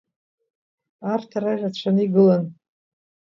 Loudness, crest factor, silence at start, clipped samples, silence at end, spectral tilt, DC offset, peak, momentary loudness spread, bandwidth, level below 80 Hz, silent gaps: -21 LUFS; 18 dB; 1 s; under 0.1%; 0.75 s; -8.5 dB/octave; under 0.1%; -4 dBFS; 12 LU; 7 kHz; -72 dBFS; none